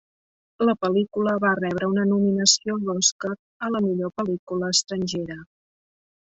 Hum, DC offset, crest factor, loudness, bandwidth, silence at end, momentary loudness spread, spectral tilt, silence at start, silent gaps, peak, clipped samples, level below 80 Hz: none; under 0.1%; 22 dB; -23 LUFS; 8.2 kHz; 0.95 s; 12 LU; -3.5 dB/octave; 0.6 s; 3.12-3.19 s, 3.39-3.60 s, 4.39-4.47 s; -2 dBFS; under 0.1%; -62 dBFS